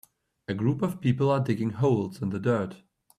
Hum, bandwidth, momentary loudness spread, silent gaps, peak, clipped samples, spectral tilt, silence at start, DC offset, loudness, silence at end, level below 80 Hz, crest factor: none; 13 kHz; 9 LU; none; -12 dBFS; under 0.1%; -8.5 dB/octave; 0.5 s; under 0.1%; -27 LUFS; 0.4 s; -64 dBFS; 16 dB